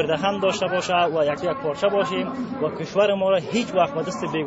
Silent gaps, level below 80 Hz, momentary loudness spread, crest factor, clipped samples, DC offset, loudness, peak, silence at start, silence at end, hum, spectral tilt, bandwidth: none; -58 dBFS; 7 LU; 16 dB; under 0.1%; under 0.1%; -22 LUFS; -6 dBFS; 0 s; 0 s; none; -5 dB/octave; 8 kHz